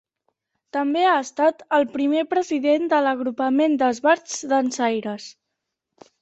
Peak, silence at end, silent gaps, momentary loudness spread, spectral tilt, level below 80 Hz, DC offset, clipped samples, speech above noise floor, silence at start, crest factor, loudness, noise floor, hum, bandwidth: -6 dBFS; 0.9 s; none; 7 LU; -3.5 dB/octave; -70 dBFS; under 0.1%; under 0.1%; 60 dB; 0.75 s; 16 dB; -21 LUFS; -81 dBFS; none; 8.2 kHz